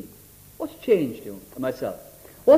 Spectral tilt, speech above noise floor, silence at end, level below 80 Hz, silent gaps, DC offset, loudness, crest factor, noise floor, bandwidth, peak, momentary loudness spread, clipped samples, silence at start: -6.5 dB/octave; 23 dB; 0 s; -58 dBFS; none; under 0.1%; -27 LUFS; 20 dB; -49 dBFS; 15.5 kHz; -4 dBFS; 23 LU; under 0.1%; 0.05 s